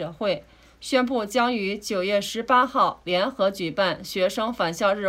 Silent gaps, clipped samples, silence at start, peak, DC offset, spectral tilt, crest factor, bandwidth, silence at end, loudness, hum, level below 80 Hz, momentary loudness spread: none; under 0.1%; 0 s; -8 dBFS; under 0.1%; -4 dB/octave; 16 dB; 16 kHz; 0 s; -24 LUFS; none; -58 dBFS; 6 LU